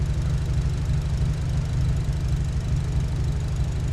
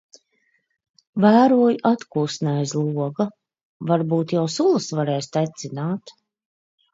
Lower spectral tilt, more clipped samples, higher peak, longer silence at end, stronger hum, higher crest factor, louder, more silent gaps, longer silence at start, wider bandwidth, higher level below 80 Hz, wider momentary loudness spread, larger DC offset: about the same, -7 dB/octave vs -6.5 dB/octave; neither; second, -12 dBFS vs -4 dBFS; second, 0 s vs 0.85 s; first, 50 Hz at -30 dBFS vs none; second, 10 dB vs 18 dB; second, -26 LUFS vs -21 LUFS; second, none vs 3.65-3.80 s; second, 0 s vs 1.15 s; first, 12 kHz vs 8 kHz; first, -28 dBFS vs -70 dBFS; second, 2 LU vs 12 LU; neither